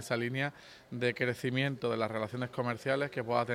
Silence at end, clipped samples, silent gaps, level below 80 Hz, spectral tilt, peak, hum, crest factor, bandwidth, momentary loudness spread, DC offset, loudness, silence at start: 0 s; under 0.1%; none; -72 dBFS; -6 dB/octave; -16 dBFS; none; 18 dB; 16 kHz; 5 LU; under 0.1%; -34 LUFS; 0 s